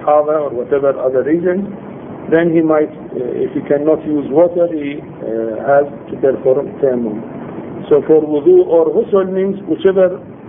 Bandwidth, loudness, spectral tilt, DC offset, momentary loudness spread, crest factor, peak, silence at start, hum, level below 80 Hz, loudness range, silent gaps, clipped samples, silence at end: 3.7 kHz; -14 LUFS; -11.5 dB/octave; under 0.1%; 13 LU; 14 dB; 0 dBFS; 0 s; none; -52 dBFS; 3 LU; none; under 0.1%; 0 s